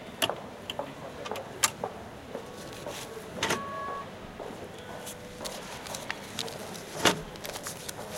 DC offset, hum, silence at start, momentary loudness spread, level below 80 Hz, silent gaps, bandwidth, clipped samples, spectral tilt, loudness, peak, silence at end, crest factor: under 0.1%; none; 0 s; 13 LU; -60 dBFS; none; 17 kHz; under 0.1%; -2 dB/octave; -34 LUFS; -6 dBFS; 0 s; 30 dB